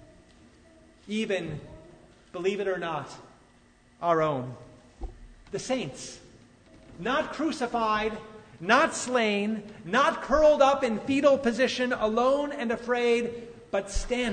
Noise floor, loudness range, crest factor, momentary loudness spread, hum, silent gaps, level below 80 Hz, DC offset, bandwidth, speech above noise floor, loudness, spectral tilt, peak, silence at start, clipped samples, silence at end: -59 dBFS; 10 LU; 20 dB; 19 LU; none; none; -46 dBFS; under 0.1%; 9.6 kHz; 33 dB; -27 LUFS; -4.5 dB/octave; -8 dBFS; 1.05 s; under 0.1%; 0 s